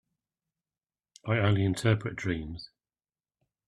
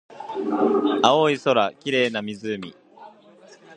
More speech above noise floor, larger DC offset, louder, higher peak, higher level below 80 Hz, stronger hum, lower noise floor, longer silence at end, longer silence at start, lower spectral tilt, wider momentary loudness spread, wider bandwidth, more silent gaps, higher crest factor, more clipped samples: first, over 62 dB vs 29 dB; neither; second, -29 LUFS vs -22 LUFS; second, -10 dBFS vs 0 dBFS; first, -56 dBFS vs -70 dBFS; neither; first, under -90 dBFS vs -50 dBFS; first, 1 s vs 0 s; first, 1.25 s vs 0.1 s; first, -6.5 dB/octave vs -4.5 dB/octave; first, 18 LU vs 14 LU; first, 11.5 kHz vs 9.8 kHz; neither; about the same, 22 dB vs 22 dB; neither